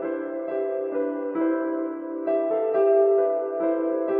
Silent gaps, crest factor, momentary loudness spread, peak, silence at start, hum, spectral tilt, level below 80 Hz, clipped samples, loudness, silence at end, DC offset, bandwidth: none; 14 dB; 10 LU; -10 dBFS; 0 s; none; -10 dB/octave; under -90 dBFS; under 0.1%; -24 LUFS; 0 s; under 0.1%; 3.6 kHz